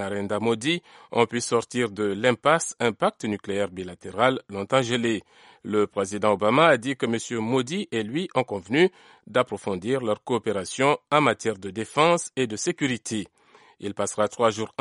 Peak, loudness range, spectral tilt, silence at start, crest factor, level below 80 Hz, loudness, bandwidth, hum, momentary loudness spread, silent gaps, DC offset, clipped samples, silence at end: -4 dBFS; 3 LU; -4.5 dB/octave; 0 s; 20 dB; -66 dBFS; -25 LUFS; 11.5 kHz; none; 9 LU; none; under 0.1%; under 0.1%; 0.15 s